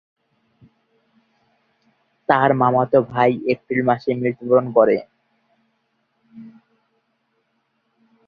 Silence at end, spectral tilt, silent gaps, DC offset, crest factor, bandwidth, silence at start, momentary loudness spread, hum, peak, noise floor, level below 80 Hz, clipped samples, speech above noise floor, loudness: 1.8 s; -9.5 dB/octave; none; under 0.1%; 20 dB; 5.2 kHz; 2.3 s; 8 LU; none; -2 dBFS; -69 dBFS; -62 dBFS; under 0.1%; 52 dB; -18 LUFS